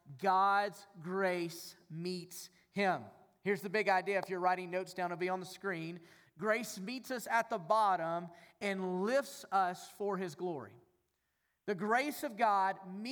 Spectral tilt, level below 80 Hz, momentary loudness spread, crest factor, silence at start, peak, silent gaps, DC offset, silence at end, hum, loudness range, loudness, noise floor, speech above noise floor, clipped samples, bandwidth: -4.5 dB/octave; -88 dBFS; 13 LU; 18 dB; 0.05 s; -18 dBFS; none; under 0.1%; 0 s; none; 3 LU; -36 LUFS; -82 dBFS; 47 dB; under 0.1%; over 20 kHz